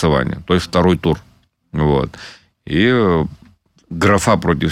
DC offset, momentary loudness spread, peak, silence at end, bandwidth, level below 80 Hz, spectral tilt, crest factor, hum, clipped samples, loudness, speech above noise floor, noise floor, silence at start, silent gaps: under 0.1%; 14 LU; -2 dBFS; 0 s; 14.5 kHz; -34 dBFS; -6 dB/octave; 14 dB; none; under 0.1%; -16 LUFS; 34 dB; -50 dBFS; 0 s; none